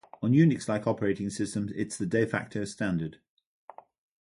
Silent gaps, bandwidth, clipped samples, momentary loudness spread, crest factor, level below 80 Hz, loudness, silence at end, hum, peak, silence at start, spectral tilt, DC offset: none; 11.5 kHz; under 0.1%; 11 LU; 18 dB; -60 dBFS; -29 LUFS; 1.05 s; none; -10 dBFS; 0.2 s; -6.5 dB/octave; under 0.1%